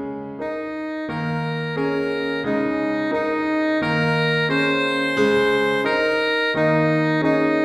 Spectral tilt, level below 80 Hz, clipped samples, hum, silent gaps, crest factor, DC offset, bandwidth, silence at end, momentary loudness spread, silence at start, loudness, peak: -6.5 dB/octave; -56 dBFS; under 0.1%; none; none; 14 dB; under 0.1%; 12.5 kHz; 0 s; 9 LU; 0 s; -21 LUFS; -6 dBFS